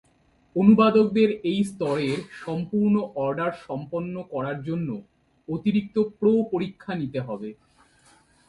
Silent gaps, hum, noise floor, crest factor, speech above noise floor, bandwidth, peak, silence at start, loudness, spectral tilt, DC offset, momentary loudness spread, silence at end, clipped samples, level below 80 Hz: none; none; -62 dBFS; 20 dB; 39 dB; 11.5 kHz; -6 dBFS; 0.55 s; -24 LUFS; -8 dB/octave; under 0.1%; 14 LU; 0.95 s; under 0.1%; -60 dBFS